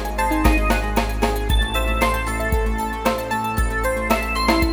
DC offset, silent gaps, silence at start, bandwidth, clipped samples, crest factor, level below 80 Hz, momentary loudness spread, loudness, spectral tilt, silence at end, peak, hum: under 0.1%; none; 0 s; 18.5 kHz; under 0.1%; 18 dB; -24 dBFS; 4 LU; -21 LUFS; -5 dB/octave; 0 s; -2 dBFS; none